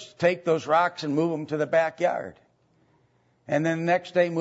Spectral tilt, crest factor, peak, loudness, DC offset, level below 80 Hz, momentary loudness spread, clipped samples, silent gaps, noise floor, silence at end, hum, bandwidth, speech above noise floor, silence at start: -6 dB/octave; 18 dB; -8 dBFS; -25 LUFS; under 0.1%; -70 dBFS; 6 LU; under 0.1%; none; -65 dBFS; 0 s; none; 8 kHz; 41 dB; 0 s